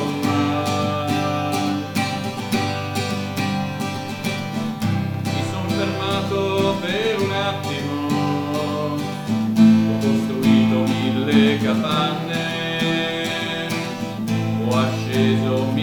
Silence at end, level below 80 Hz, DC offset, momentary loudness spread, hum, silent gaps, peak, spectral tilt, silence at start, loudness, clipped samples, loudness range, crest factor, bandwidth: 0 s; -56 dBFS; under 0.1%; 8 LU; none; none; -2 dBFS; -6 dB/octave; 0 s; -21 LUFS; under 0.1%; 6 LU; 18 dB; 18.5 kHz